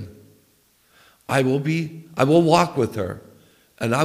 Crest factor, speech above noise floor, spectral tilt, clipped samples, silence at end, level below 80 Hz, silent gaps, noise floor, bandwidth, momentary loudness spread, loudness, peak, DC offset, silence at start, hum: 20 dB; 41 dB; -6 dB/octave; under 0.1%; 0 s; -58 dBFS; none; -60 dBFS; 16 kHz; 19 LU; -21 LUFS; -2 dBFS; under 0.1%; 0 s; none